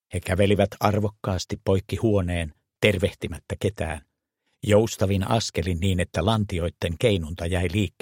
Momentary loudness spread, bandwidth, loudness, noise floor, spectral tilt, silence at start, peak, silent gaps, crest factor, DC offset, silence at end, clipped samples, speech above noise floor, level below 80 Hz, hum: 9 LU; 16.5 kHz; -24 LUFS; -75 dBFS; -6 dB/octave; 0.1 s; -2 dBFS; none; 22 dB; under 0.1%; 0.1 s; under 0.1%; 52 dB; -42 dBFS; none